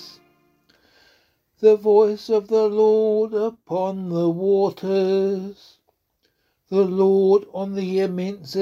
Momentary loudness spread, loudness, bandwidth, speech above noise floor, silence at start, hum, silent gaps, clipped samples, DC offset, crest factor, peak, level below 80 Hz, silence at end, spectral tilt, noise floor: 9 LU; -20 LUFS; 7.2 kHz; 50 dB; 0 s; none; none; under 0.1%; under 0.1%; 18 dB; -4 dBFS; -68 dBFS; 0 s; -8 dB/octave; -69 dBFS